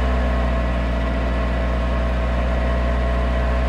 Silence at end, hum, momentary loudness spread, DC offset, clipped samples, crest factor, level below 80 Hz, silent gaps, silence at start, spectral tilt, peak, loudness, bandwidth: 0 s; 60 Hz at -25 dBFS; 1 LU; under 0.1%; under 0.1%; 10 dB; -20 dBFS; none; 0 s; -7.5 dB/octave; -10 dBFS; -22 LUFS; 7.2 kHz